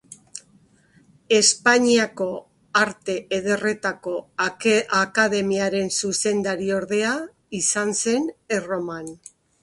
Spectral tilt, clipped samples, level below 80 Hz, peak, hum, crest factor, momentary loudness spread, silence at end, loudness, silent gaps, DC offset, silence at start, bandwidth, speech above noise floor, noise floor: -2.5 dB/octave; under 0.1%; -62 dBFS; -4 dBFS; none; 20 dB; 14 LU; 0.5 s; -21 LUFS; none; under 0.1%; 0.1 s; 11.5 kHz; 35 dB; -57 dBFS